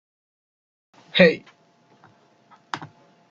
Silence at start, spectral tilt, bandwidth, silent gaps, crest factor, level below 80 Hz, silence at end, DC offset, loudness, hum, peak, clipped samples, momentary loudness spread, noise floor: 1.15 s; -6 dB/octave; 7.4 kHz; none; 24 dB; -64 dBFS; 0.45 s; under 0.1%; -19 LUFS; none; -2 dBFS; under 0.1%; 18 LU; -59 dBFS